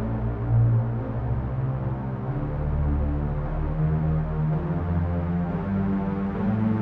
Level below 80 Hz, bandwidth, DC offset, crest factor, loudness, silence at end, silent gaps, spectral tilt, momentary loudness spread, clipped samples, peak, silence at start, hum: -32 dBFS; 3.9 kHz; under 0.1%; 12 dB; -26 LUFS; 0 s; none; -12 dB/octave; 6 LU; under 0.1%; -12 dBFS; 0 s; none